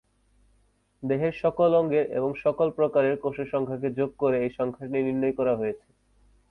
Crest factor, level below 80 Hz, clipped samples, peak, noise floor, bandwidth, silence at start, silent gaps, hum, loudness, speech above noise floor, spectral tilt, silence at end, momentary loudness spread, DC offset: 16 dB; -60 dBFS; under 0.1%; -12 dBFS; -66 dBFS; 5.6 kHz; 1 s; none; 50 Hz at -60 dBFS; -26 LUFS; 41 dB; -9.5 dB/octave; 0.75 s; 7 LU; under 0.1%